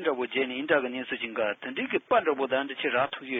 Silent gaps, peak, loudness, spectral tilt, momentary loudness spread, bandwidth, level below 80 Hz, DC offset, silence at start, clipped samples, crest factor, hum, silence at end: none; -10 dBFS; -28 LUFS; -7 dB/octave; 7 LU; 4 kHz; -70 dBFS; under 0.1%; 0 s; under 0.1%; 18 dB; none; 0 s